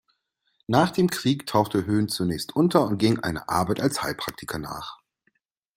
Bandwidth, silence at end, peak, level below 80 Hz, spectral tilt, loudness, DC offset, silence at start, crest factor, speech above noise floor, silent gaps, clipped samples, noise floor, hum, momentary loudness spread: 16.5 kHz; 0.8 s; -4 dBFS; -56 dBFS; -5.5 dB/octave; -24 LUFS; under 0.1%; 0.7 s; 22 dB; 49 dB; none; under 0.1%; -73 dBFS; none; 12 LU